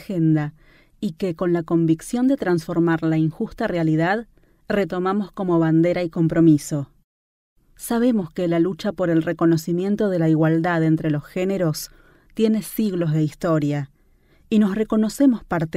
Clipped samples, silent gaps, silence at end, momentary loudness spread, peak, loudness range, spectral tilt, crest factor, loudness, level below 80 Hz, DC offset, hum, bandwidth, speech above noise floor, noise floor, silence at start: under 0.1%; 7.04-7.56 s; 0 s; 8 LU; -4 dBFS; 2 LU; -7 dB/octave; 16 dB; -21 LUFS; -52 dBFS; under 0.1%; none; 15.5 kHz; 37 dB; -57 dBFS; 0 s